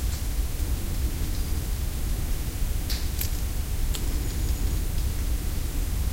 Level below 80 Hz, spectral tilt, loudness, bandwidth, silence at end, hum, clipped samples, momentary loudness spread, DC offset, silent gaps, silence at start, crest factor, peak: -28 dBFS; -4.5 dB/octave; -30 LUFS; 16.5 kHz; 0 s; none; under 0.1%; 2 LU; under 0.1%; none; 0 s; 12 dB; -14 dBFS